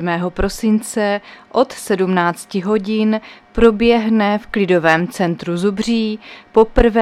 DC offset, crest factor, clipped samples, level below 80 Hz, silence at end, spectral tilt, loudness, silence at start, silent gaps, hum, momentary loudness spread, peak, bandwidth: under 0.1%; 16 dB; under 0.1%; -32 dBFS; 0 s; -6 dB/octave; -16 LUFS; 0 s; none; none; 8 LU; 0 dBFS; 14.5 kHz